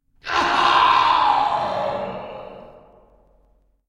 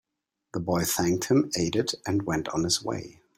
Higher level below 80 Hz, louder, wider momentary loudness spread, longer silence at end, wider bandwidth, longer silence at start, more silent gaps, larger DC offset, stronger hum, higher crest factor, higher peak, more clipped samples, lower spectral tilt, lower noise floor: about the same, -52 dBFS vs -56 dBFS; first, -18 LUFS vs -27 LUFS; first, 20 LU vs 10 LU; first, 1.2 s vs 0.25 s; second, 11 kHz vs 16.5 kHz; second, 0.25 s vs 0.55 s; neither; neither; neither; about the same, 16 dB vs 18 dB; first, -4 dBFS vs -10 dBFS; neither; second, -3 dB/octave vs -4.5 dB/octave; second, -60 dBFS vs -83 dBFS